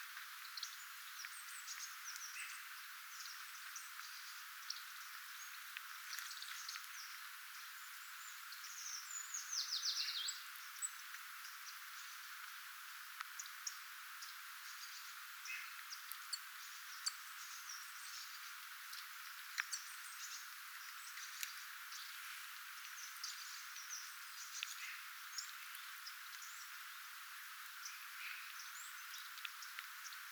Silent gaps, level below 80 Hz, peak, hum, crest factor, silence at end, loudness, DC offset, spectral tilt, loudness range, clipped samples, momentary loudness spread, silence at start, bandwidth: none; under -90 dBFS; -20 dBFS; none; 30 dB; 0 s; -48 LUFS; under 0.1%; 9 dB/octave; 6 LU; under 0.1%; 6 LU; 0 s; over 20 kHz